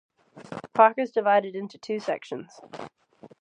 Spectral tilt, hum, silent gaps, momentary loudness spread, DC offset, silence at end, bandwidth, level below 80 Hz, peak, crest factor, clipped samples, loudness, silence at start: -5.5 dB/octave; none; none; 22 LU; under 0.1%; 0.15 s; 9.4 kHz; -78 dBFS; -4 dBFS; 22 dB; under 0.1%; -24 LUFS; 0.35 s